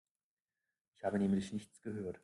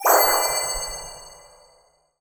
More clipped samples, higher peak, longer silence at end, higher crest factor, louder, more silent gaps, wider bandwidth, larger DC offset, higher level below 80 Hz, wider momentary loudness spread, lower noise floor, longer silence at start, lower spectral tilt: neither; second, -22 dBFS vs -4 dBFS; second, 0.05 s vs 0.85 s; about the same, 18 dB vs 20 dB; second, -39 LUFS vs -20 LUFS; neither; second, 11 kHz vs over 20 kHz; neither; second, -72 dBFS vs -46 dBFS; second, 11 LU vs 21 LU; first, under -90 dBFS vs -60 dBFS; first, 1.05 s vs 0 s; first, -7 dB/octave vs 0 dB/octave